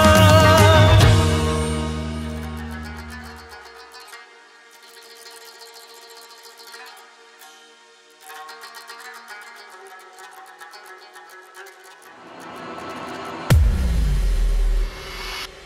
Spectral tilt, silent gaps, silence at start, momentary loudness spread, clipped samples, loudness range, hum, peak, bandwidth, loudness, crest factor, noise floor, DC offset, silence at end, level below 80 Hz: -5 dB/octave; none; 0 s; 29 LU; under 0.1%; 22 LU; none; -2 dBFS; 16 kHz; -18 LUFS; 20 dB; -50 dBFS; under 0.1%; 0.2 s; -28 dBFS